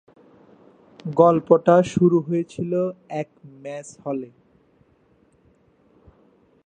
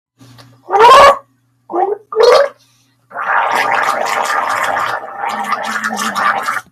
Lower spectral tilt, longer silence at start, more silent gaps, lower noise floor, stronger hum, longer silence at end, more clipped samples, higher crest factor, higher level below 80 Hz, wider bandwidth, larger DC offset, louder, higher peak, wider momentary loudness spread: first, -8 dB/octave vs -2 dB/octave; first, 1.05 s vs 0.7 s; neither; first, -60 dBFS vs -53 dBFS; neither; first, 2.4 s vs 0.1 s; second, under 0.1% vs 0.2%; first, 22 dB vs 14 dB; second, -62 dBFS vs -50 dBFS; second, 9.4 kHz vs 15.5 kHz; neither; second, -20 LUFS vs -12 LUFS; about the same, -2 dBFS vs 0 dBFS; first, 20 LU vs 14 LU